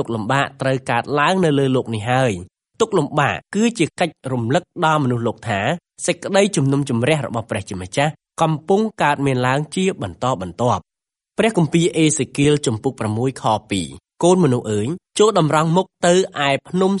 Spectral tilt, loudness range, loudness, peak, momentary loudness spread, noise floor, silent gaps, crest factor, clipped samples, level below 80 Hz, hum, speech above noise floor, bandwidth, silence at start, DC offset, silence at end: -5.5 dB/octave; 2 LU; -19 LUFS; 0 dBFS; 7 LU; -70 dBFS; none; 18 dB; under 0.1%; -54 dBFS; none; 52 dB; 11.5 kHz; 0 s; under 0.1%; 0 s